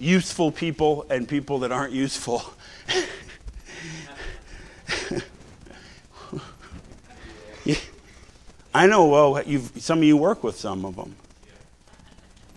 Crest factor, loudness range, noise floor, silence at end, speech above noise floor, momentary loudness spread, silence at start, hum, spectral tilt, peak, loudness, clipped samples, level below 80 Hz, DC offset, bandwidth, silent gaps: 22 dB; 15 LU; -51 dBFS; 1.4 s; 30 dB; 26 LU; 0 s; none; -5 dB/octave; -2 dBFS; -22 LUFS; under 0.1%; -48 dBFS; under 0.1%; 12 kHz; none